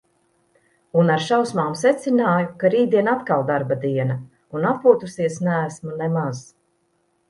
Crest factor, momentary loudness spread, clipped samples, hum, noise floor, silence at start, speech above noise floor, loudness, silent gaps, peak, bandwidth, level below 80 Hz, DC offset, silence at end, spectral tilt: 20 dB; 9 LU; under 0.1%; none; -67 dBFS; 0.95 s; 47 dB; -20 LUFS; none; -2 dBFS; 11.5 kHz; -66 dBFS; under 0.1%; 0.9 s; -6.5 dB/octave